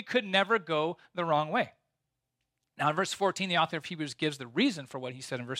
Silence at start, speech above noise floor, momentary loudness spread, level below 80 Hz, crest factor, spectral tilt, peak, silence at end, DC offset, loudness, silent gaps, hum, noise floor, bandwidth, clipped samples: 0 s; 54 dB; 11 LU; -80 dBFS; 20 dB; -4.5 dB/octave; -12 dBFS; 0 s; under 0.1%; -30 LUFS; none; none; -85 dBFS; 15.5 kHz; under 0.1%